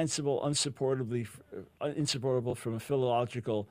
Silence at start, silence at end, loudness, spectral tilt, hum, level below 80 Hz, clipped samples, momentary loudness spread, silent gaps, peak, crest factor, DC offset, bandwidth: 0 s; 0.05 s; -32 LUFS; -4.5 dB/octave; none; -66 dBFS; under 0.1%; 8 LU; none; -18 dBFS; 16 dB; under 0.1%; 15.5 kHz